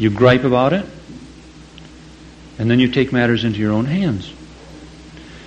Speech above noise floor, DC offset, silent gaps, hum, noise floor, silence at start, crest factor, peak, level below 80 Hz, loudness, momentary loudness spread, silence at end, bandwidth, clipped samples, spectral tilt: 25 dB; under 0.1%; none; none; -40 dBFS; 0 s; 18 dB; 0 dBFS; -44 dBFS; -16 LUFS; 25 LU; 0 s; 8.8 kHz; under 0.1%; -7.5 dB/octave